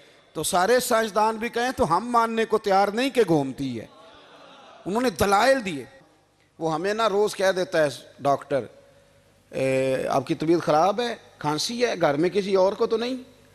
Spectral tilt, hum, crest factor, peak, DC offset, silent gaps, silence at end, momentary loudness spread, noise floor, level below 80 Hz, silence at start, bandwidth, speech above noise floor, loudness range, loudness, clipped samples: -4.5 dB/octave; none; 18 dB; -6 dBFS; under 0.1%; none; 0.3 s; 10 LU; -61 dBFS; -56 dBFS; 0.35 s; 14 kHz; 38 dB; 3 LU; -23 LUFS; under 0.1%